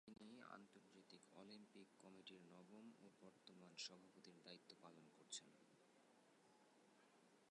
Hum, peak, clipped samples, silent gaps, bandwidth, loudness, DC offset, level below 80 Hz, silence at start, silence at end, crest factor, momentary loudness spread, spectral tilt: none; -40 dBFS; under 0.1%; none; 11 kHz; -62 LUFS; under 0.1%; under -90 dBFS; 0.05 s; 0 s; 26 dB; 11 LU; -2.5 dB/octave